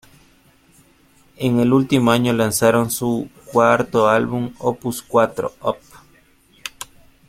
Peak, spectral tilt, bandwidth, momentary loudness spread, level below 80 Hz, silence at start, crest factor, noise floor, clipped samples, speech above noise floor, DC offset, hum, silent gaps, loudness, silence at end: -2 dBFS; -5.5 dB/octave; 16.5 kHz; 16 LU; -52 dBFS; 1.4 s; 18 dB; -54 dBFS; under 0.1%; 36 dB; under 0.1%; none; none; -18 LUFS; 0.45 s